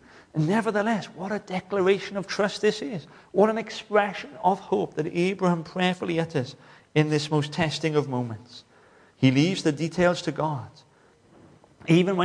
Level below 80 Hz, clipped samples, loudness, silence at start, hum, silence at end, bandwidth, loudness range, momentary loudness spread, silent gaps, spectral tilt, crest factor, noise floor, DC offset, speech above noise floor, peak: -62 dBFS; under 0.1%; -25 LUFS; 0.35 s; none; 0 s; 10.5 kHz; 1 LU; 10 LU; none; -6 dB/octave; 20 dB; -58 dBFS; under 0.1%; 33 dB; -6 dBFS